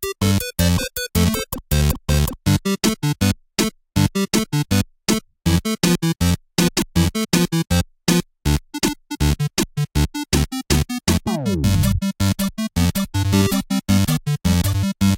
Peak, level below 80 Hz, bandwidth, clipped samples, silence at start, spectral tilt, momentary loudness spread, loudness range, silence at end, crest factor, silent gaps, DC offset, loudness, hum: -2 dBFS; -30 dBFS; 17 kHz; under 0.1%; 0 s; -5 dB/octave; 4 LU; 1 LU; 0 s; 16 dB; none; under 0.1%; -20 LUFS; none